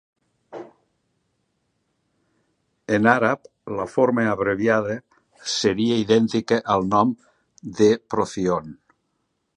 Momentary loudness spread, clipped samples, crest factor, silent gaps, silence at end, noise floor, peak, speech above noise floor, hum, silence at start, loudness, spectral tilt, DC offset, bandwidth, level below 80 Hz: 20 LU; under 0.1%; 22 dB; none; 0.85 s; -73 dBFS; 0 dBFS; 53 dB; none; 0.5 s; -21 LUFS; -5 dB/octave; under 0.1%; 10.5 kHz; -58 dBFS